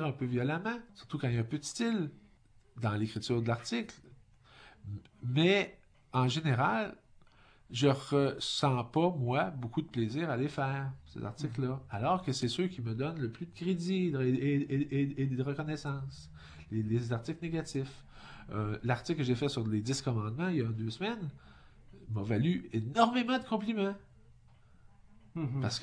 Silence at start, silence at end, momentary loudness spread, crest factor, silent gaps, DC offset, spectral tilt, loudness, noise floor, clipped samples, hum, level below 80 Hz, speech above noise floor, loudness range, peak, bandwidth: 0 s; 0 s; 12 LU; 22 dB; none; under 0.1%; -6 dB/octave; -34 LUFS; -63 dBFS; under 0.1%; none; -62 dBFS; 30 dB; 4 LU; -12 dBFS; 10.5 kHz